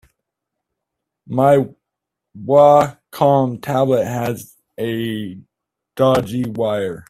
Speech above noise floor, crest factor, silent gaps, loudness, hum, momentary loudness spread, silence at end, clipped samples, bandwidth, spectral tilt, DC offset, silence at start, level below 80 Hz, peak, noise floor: 65 dB; 18 dB; none; -17 LUFS; none; 17 LU; 0.1 s; under 0.1%; 14.5 kHz; -7 dB/octave; under 0.1%; 1.3 s; -54 dBFS; 0 dBFS; -81 dBFS